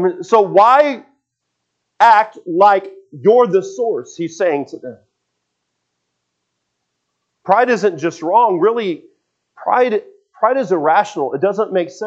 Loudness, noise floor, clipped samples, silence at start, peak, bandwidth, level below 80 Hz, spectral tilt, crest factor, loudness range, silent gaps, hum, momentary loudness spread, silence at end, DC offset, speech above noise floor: -15 LUFS; -75 dBFS; under 0.1%; 0 s; 0 dBFS; 8.2 kHz; -74 dBFS; -5.5 dB/octave; 16 dB; 11 LU; none; 60 Hz at -55 dBFS; 14 LU; 0 s; under 0.1%; 60 dB